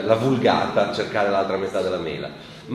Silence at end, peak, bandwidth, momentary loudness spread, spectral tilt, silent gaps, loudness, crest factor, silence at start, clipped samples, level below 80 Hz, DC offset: 0 s; -2 dBFS; 13 kHz; 12 LU; -6 dB/octave; none; -22 LUFS; 20 dB; 0 s; under 0.1%; -56 dBFS; under 0.1%